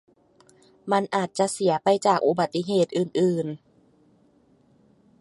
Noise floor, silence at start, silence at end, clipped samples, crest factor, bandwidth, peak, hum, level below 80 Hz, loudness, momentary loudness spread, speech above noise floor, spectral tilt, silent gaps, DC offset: -60 dBFS; 0.85 s; 1.65 s; under 0.1%; 20 dB; 11.5 kHz; -6 dBFS; none; -72 dBFS; -24 LUFS; 8 LU; 38 dB; -5.5 dB/octave; none; under 0.1%